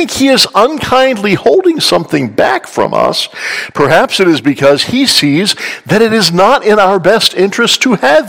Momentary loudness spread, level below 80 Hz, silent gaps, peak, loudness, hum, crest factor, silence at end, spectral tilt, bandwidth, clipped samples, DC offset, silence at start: 6 LU; -46 dBFS; none; 0 dBFS; -9 LUFS; none; 10 dB; 0 s; -4 dB/octave; over 20 kHz; 3%; under 0.1%; 0 s